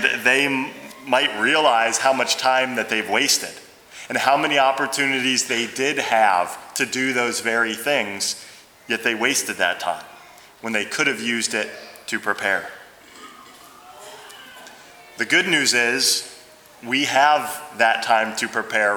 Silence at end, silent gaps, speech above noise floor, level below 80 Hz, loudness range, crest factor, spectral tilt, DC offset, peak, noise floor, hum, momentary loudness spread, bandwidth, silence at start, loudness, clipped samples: 0 s; none; 26 dB; -70 dBFS; 6 LU; 20 dB; -1.5 dB/octave; under 0.1%; -2 dBFS; -46 dBFS; none; 15 LU; over 20 kHz; 0 s; -20 LUFS; under 0.1%